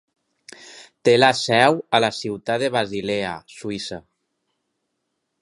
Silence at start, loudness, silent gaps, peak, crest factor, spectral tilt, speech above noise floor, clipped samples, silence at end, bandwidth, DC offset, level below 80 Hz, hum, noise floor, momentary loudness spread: 0.6 s; -20 LUFS; none; 0 dBFS; 22 dB; -4 dB/octave; 56 dB; under 0.1%; 1.4 s; 11.5 kHz; under 0.1%; -60 dBFS; none; -76 dBFS; 17 LU